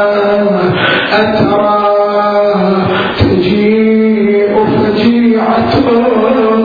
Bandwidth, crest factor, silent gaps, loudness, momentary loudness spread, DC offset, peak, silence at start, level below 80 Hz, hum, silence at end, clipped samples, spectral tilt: 5 kHz; 10 dB; none; -10 LUFS; 2 LU; under 0.1%; 0 dBFS; 0 s; -36 dBFS; none; 0 s; under 0.1%; -8.5 dB/octave